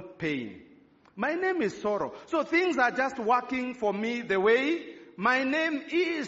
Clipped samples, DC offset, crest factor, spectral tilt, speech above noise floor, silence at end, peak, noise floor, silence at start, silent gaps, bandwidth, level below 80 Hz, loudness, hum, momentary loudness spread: under 0.1%; under 0.1%; 18 dB; -2.5 dB/octave; 29 dB; 0 s; -10 dBFS; -56 dBFS; 0 s; none; 7.6 kHz; -68 dBFS; -28 LUFS; none; 9 LU